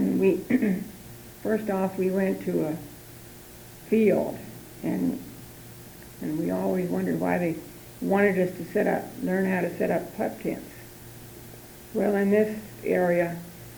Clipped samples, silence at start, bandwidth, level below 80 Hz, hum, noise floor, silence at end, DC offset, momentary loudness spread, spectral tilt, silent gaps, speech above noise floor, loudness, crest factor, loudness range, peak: under 0.1%; 0 s; over 20 kHz; -58 dBFS; none; -45 dBFS; 0 s; under 0.1%; 20 LU; -7 dB/octave; none; 20 dB; -27 LUFS; 18 dB; 3 LU; -8 dBFS